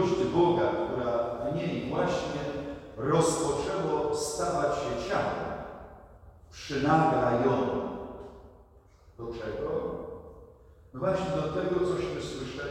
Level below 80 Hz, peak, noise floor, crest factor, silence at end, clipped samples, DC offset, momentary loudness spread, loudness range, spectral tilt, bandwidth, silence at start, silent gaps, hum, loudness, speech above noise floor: -52 dBFS; -12 dBFS; -57 dBFS; 18 dB; 0 s; under 0.1%; under 0.1%; 18 LU; 6 LU; -5.5 dB/octave; 14.5 kHz; 0 s; none; none; -29 LUFS; 28 dB